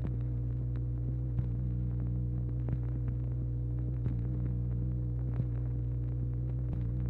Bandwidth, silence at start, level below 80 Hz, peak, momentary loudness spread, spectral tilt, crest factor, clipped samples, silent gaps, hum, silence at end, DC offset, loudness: 2.4 kHz; 0 s; -38 dBFS; -20 dBFS; 1 LU; -12 dB/octave; 14 dB; under 0.1%; none; none; 0 s; under 0.1%; -35 LUFS